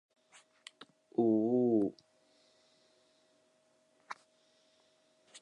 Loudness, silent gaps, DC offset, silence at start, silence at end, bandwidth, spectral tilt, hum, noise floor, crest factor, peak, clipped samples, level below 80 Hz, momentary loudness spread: -32 LUFS; none; under 0.1%; 1.2 s; 0.05 s; 10.5 kHz; -7.5 dB/octave; none; -72 dBFS; 18 dB; -18 dBFS; under 0.1%; -84 dBFS; 25 LU